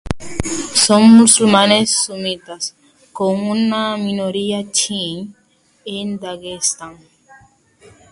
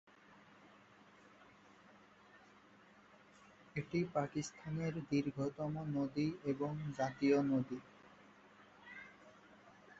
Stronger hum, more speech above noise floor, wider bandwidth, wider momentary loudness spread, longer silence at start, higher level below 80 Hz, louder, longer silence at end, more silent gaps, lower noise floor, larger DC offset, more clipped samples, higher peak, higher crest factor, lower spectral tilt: neither; first, 34 dB vs 26 dB; first, 11.5 kHz vs 7.6 kHz; second, 18 LU vs 28 LU; second, 0.05 s vs 0.3 s; first, -44 dBFS vs -74 dBFS; first, -15 LUFS vs -39 LUFS; first, 1.2 s vs 0.05 s; neither; second, -49 dBFS vs -65 dBFS; neither; neither; first, 0 dBFS vs -22 dBFS; about the same, 16 dB vs 20 dB; second, -3 dB/octave vs -7 dB/octave